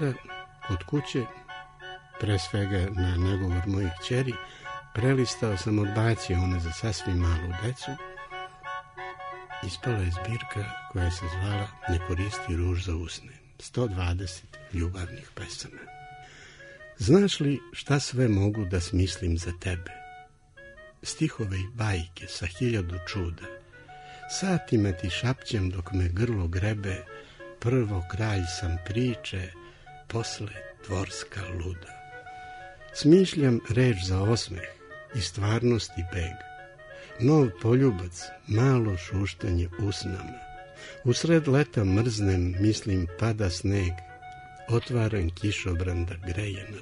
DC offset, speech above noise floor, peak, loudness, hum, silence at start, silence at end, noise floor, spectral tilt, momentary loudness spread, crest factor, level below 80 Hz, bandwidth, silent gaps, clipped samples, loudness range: under 0.1%; 24 dB; -8 dBFS; -28 LUFS; none; 0 s; 0 s; -51 dBFS; -6 dB/octave; 19 LU; 20 dB; -44 dBFS; 11 kHz; none; under 0.1%; 7 LU